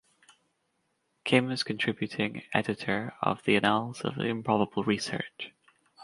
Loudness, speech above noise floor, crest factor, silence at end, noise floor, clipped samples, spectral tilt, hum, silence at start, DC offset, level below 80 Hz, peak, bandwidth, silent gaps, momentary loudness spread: -29 LUFS; 47 dB; 24 dB; 0 s; -76 dBFS; under 0.1%; -5.5 dB/octave; none; 1.25 s; under 0.1%; -66 dBFS; -8 dBFS; 11.5 kHz; none; 10 LU